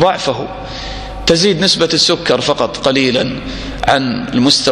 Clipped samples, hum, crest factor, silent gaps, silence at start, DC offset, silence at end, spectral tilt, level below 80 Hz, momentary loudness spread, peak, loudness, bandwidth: under 0.1%; none; 14 dB; none; 0 s; under 0.1%; 0 s; -3.5 dB/octave; -34 dBFS; 14 LU; 0 dBFS; -13 LUFS; 14 kHz